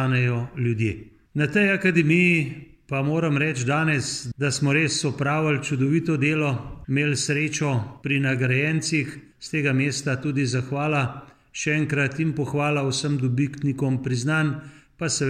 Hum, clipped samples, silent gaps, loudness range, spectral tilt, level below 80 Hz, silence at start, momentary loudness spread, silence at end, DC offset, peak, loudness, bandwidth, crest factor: none; under 0.1%; none; 3 LU; -5.5 dB/octave; -56 dBFS; 0 s; 9 LU; 0 s; under 0.1%; -6 dBFS; -23 LUFS; 12 kHz; 18 dB